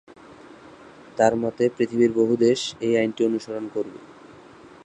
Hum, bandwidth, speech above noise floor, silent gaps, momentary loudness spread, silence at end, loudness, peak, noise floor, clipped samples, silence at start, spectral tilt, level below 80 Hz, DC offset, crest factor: none; 9.8 kHz; 25 dB; none; 11 LU; 0.2 s; -22 LUFS; -4 dBFS; -47 dBFS; under 0.1%; 0.3 s; -5.5 dB/octave; -64 dBFS; under 0.1%; 20 dB